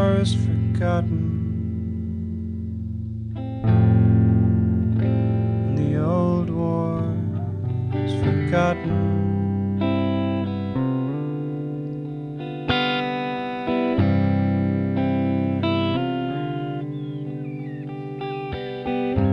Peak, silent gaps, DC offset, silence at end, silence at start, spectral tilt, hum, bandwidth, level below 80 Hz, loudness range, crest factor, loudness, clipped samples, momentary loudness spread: -6 dBFS; none; under 0.1%; 0 s; 0 s; -8.5 dB/octave; none; 9.6 kHz; -42 dBFS; 5 LU; 16 dB; -23 LUFS; under 0.1%; 10 LU